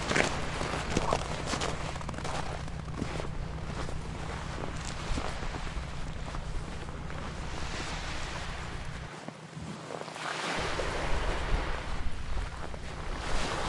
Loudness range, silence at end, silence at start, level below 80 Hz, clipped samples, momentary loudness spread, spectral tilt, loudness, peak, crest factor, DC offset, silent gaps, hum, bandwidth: 4 LU; 0 s; 0 s; -38 dBFS; under 0.1%; 8 LU; -4.5 dB/octave; -36 LUFS; -6 dBFS; 26 dB; under 0.1%; none; none; 11.5 kHz